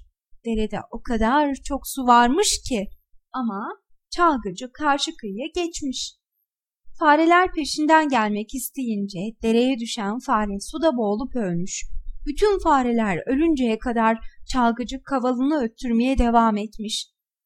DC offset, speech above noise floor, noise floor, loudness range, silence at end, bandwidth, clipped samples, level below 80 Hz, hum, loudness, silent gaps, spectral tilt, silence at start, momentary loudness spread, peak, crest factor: under 0.1%; 57 dB; -79 dBFS; 4 LU; 0.4 s; 16 kHz; under 0.1%; -38 dBFS; none; -22 LUFS; none; -4 dB/octave; 0.35 s; 13 LU; -2 dBFS; 20 dB